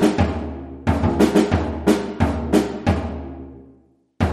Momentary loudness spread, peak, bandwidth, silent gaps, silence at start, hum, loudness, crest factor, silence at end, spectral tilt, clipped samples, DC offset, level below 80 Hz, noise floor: 15 LU; -4 dBFS; 13.5 kHz; none; 0 s; none; -20 LUFS; 18 dB; 0 s; -7 dB/octave; under 0.1%; under 0.1%; -32 dBFS; -54 dBFS